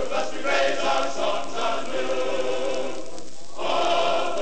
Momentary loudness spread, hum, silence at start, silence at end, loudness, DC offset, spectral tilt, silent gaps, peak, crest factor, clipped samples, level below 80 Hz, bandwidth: 11 LU; none; 0 s; 0 s; -25 LUFS; 6%; -2.5 dB/octave; none; -8 dBFS; 16 dB; under 0.1%; -58 dBFS; 9 kHz